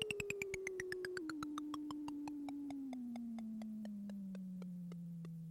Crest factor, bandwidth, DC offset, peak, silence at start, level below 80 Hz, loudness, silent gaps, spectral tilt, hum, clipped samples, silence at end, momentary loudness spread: 20 dB; 16.5 kHz; under 0.1%; -26 dBFS; 0 s; -74 dBFS; -46 LUFS; none; -5 dB/octave; none; under 0.1%; 0 s; 6 LU